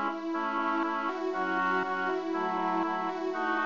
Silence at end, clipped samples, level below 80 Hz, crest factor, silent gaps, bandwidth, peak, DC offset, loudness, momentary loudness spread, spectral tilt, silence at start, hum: 0 s; under 0.1%; -80 dBFS; 14 dB; none; 7.4 kHz; -16 dBFS; 0.2%; -30 LUFS; 3 LU; -5.5 dB/octave; 0 s; none